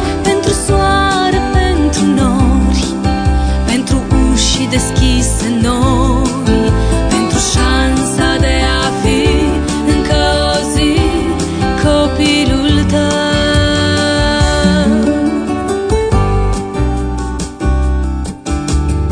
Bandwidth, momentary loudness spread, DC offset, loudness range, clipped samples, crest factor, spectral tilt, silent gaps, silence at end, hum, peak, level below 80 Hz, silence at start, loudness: 10 kHz; 5 LU; under 0.1%; 2 LU; under 0.1%; 12 dB; -5 dB/octave; none; 0 s; none; 0 dBFS; -18 dBFS; 0 s; -13 LUFS